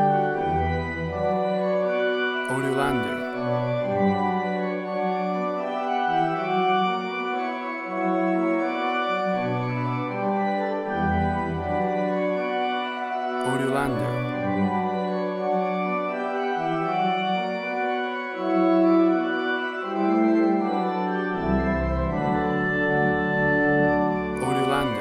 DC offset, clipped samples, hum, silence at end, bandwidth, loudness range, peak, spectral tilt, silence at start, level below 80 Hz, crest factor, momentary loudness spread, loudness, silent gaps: under 0.1%; under 0.1%; none; 0 s; 12.5 kHz; 3 LU; -10 dBFS; -7 dB/octave; 0 s; -44 dBFS; 14 dB; 6 LU; -24 LUFS; none